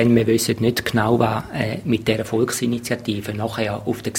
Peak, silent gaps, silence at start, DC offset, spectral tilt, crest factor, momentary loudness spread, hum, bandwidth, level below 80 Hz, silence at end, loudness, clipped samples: -2 dBFS; none; 0 s; under 0.1%; -5 dB/octave; 18 dB; 7 LU; none; 16.5 kHz; -48 dBFS; 0 s; -21 LUFS; under 0.1%